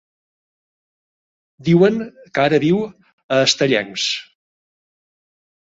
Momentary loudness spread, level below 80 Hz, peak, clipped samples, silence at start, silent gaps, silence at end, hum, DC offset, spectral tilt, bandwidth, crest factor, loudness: 12 LU; -60 dBFS; -2 dBFS; under 0.1%; 1.6 s; 3.13-3.29 s; 1.45 s; none; under 0.1%; -4.5 dB/octave; 8 kHz; 18 dB; -17 LUFS